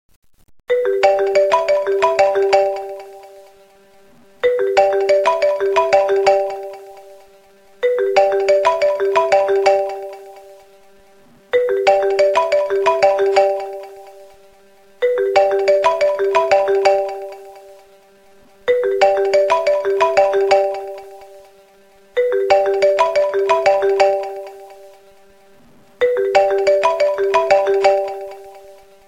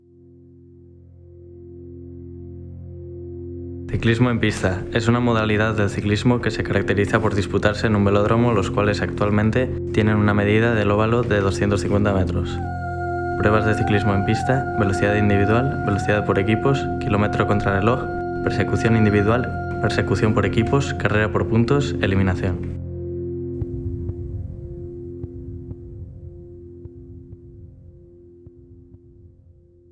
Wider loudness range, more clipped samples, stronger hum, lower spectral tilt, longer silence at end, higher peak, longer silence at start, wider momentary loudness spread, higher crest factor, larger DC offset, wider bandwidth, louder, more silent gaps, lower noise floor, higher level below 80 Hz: second, 2 LU vs 16 LU; neither; neither; second, -3 dB/octave vs -7 dB/octave; second, 0.35 s vs 0.65 s; about the same, 0 dBFS vs -2 dBFS; second, 0.7 s vs 1.3 s; second, 14 LU vs 19 LU; about the same, 16 dB vs 18 dB; neither; about the same, 10.5 kHz vs 10.5 kHz; first, -16 LUFS vs -20 LUFS; neither; about the same, -49 dBFS vs -50 dBFS; second, -58 dBFS vs -40 dBFS